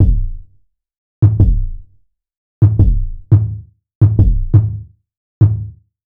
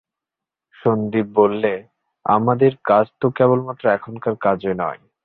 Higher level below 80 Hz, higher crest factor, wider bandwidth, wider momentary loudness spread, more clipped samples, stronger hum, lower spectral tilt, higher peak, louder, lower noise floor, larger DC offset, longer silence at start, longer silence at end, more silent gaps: first, -20 dBFS vs -58 dBFS; about the same, 14 dB vs 18 dB; second, 1.7 kHz vs 4.4 kHz; first, 17 LU vs 8 LU; neither; neither; first, -13 dB/octave vs -11.5 dB/octave; about the same, 0 dBFS vs -2 dBFS; first, -14 LUFS vs -19 LUFS; second, -55 dBFS vs -86 dBFS; neither; second, 0 s vs 0.85 s; about the same, 0.4 s vs 0.3 s; first, 0.98-1.22 s, 2.37-2.62 s, 3.95-4.01 s, 5.17-5.41 s vs none